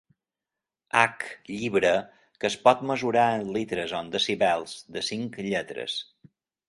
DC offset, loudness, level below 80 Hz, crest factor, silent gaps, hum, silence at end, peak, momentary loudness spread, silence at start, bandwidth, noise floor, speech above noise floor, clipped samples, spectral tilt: under 0.1%; -26 LUFS; -64 dBFS; 26 dB; none; none; 0.65 s; -2 dBFS; 10 LU; 0.95 s; 11.5 kHz; -89 dBFS; 63 dB; under 0.1%; -4 dB/octave